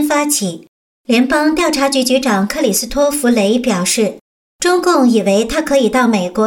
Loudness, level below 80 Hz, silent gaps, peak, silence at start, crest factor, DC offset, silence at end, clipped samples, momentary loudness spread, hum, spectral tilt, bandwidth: -14 LUFS; -42 dBFS; 0.68-1.04 s, 4.21-4.59 s; -2 dBFS; 0 s; 10 dB; under 0.1%; 0 s; under 0.1%; 5 LU; none; -3.5 dB/octave; 17.5 kHz